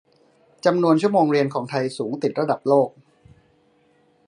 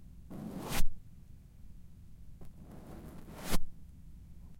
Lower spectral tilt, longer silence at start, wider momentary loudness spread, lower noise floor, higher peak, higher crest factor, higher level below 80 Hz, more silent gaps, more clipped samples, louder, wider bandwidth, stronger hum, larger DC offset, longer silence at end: first, -7 dB/octave vs -4 dB/octave; first, 0.65 s vs 0.3 s; second, 8 LU vs 19 LU; first, -60 dBFS vs -52 dBFS; first, -2 dBFS vs -14 dBFS; about the same, 20 dB vs 18 dB; second, -68 dBFS vs -42 dBFS; neither; neither; first, -21 LUFS vs -43 LUFS; second, 11 kHz vs 16.5 kHz; neither; neither; first, 1.4 s vs 0.05 s